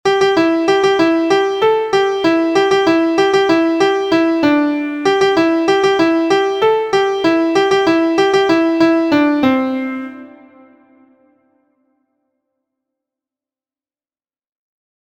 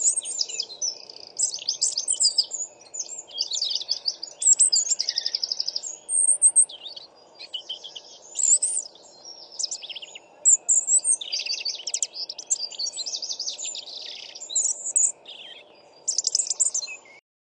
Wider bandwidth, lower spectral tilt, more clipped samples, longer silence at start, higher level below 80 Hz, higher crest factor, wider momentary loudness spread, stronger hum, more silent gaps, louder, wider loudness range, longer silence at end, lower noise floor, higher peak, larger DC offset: second, 9.4 kHz vs 12 kHz; first, -4.5 dB/octave vs 4.5 dB/octave; neither; about the same, 0.05 s vs 0 s; first, -56 dBFS vs -84 dBFS; second, 14 dB vs 20 dB; second, 3 LU vs 19 LU; neither; neither; first, -14 LUFS vs -22 LUFS; about the same, 5 LU vs 6 LU; first, 4.8 s vs 0.3 s; first, under -90 dBFS vs -51 dBFS; first, 0 dBFS vs -6 dBFS; neither